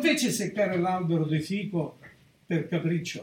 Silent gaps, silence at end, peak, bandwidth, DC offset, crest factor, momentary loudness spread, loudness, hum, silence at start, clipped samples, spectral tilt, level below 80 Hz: none; 0 s; -12 dBFS; 17.5 kHz; under 0.1%; 16 dB; 6 LU; -28 LUFS; none; 0 s; under 0.1%; -5 dB/octave; -68 dBFS